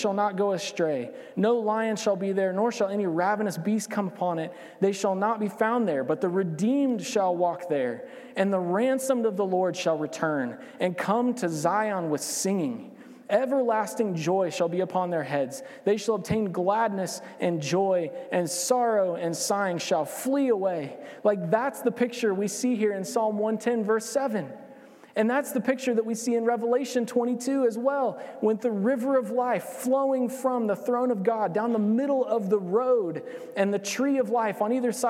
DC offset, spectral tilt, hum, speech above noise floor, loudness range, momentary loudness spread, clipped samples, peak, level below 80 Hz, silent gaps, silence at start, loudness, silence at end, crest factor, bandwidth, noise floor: under 0.1%; -5 dB/octave; none; 23 dB; 1 LU; 5 LU; under 0.1%; -10 dBFS; -70 dBFS; none; 0 s; -26 LUFS; 0 s; 16 dB; 16.5 kHz; -49 dBFS